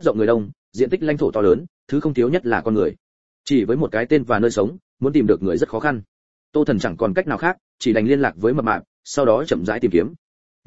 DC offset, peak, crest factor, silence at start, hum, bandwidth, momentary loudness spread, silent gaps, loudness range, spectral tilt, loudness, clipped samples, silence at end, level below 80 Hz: 0.9%; -2 dBFS; 18 dB; 0 s; none; 8 kHz; 7 LU; 0.56-0.72 s, 1.69-1.87 s, 3.00-3.44 s, 4.82-4.97 s, 6.08-6.53 s, 7.61-7.78 s, 8.87-9.03 s, 10.18-10.63 s; 1 LU; -6.5 dB/octave; -20 LUFS; under 0.1%; 0 s; -50 dBFS